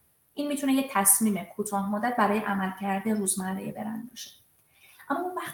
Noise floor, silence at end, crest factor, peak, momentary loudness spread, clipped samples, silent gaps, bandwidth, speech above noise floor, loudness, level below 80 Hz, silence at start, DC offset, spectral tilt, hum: -60 dBFS; 0 s; 24 dB; -6 dBFS; 16 LU; under 0.1%; none; 18 kHz; 32 dB; -27 LUFS; -70 dBFS; 0.35 s; under 0.1%; -3.5 dB/octave; none